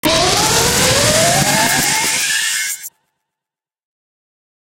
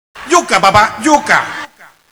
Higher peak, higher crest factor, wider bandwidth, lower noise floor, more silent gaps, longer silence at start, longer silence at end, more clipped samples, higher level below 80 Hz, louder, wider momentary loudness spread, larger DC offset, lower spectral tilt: about the same, 0 dBFS vs 0 dBFS; about the same, 16 dB vs 12 dB; second, 17 kHz vs over 20 kHz; first, -87 dBFS vs -34 dBFS; neither; about the same, 0.05 s vs 0.15 s; first, 1.75 s vs 0.45 s; second, under 0.1% vs 0.5%; first, -38 dBFS vs -44 dBFS; about the same, -12 LUFS vs -10 LUFS; second, 8 LU vs 15 LU; neither; about the same, -2 dB/octave vs -3 dB/octave